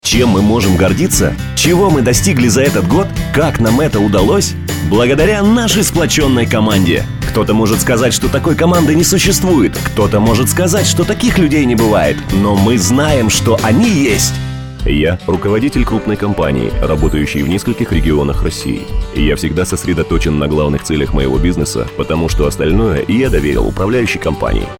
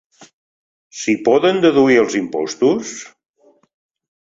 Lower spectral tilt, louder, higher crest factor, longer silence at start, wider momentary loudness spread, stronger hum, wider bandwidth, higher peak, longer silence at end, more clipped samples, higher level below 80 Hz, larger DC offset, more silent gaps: about the same, -5 dB/octave vs -4.5 dB/octave; first, -12 LUFS vs -15 LUFS; about the same, 12 dB vs 16 dB; second, 0.05 s vs 0.2 s; second, 6 LU vs 16 LU; neither; first, over 20 kHz vs 7.8 kHz; about the same, 0 dBFS vs -2 dBFS; second, 0.05 s vs 1.2 s; neither; first, -22 dBFS vs -60 dBFS; neither; second, none vs 0.33-0.90 s